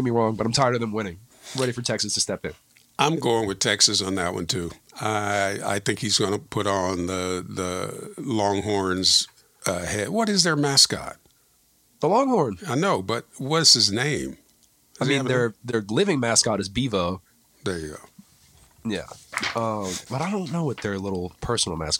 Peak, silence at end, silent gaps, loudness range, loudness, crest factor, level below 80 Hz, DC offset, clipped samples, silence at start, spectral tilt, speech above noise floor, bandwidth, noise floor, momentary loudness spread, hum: -2 dBFS; 0 s; none; 8 LU; -23 LUFS; 22 dB; -54 dBFS; under 0.1%; under 0.1%; 0 s; -3 dB/octave; 38 dB; 17 kHz; -62 dBFS; 14 LU; none